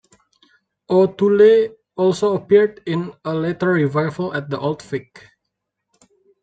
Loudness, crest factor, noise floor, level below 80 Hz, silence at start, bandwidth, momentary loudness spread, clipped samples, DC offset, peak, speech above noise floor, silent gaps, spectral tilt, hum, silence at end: -18 LUFS; 16 dB; -78 dBFS; -62 dBFS; 0.9 s; 8.8 kHz; 12 LU; under 0.1%; under 0.1%; -2 dBFS; 61 dB; none; -7.5 dB/octave; none; 1.4 s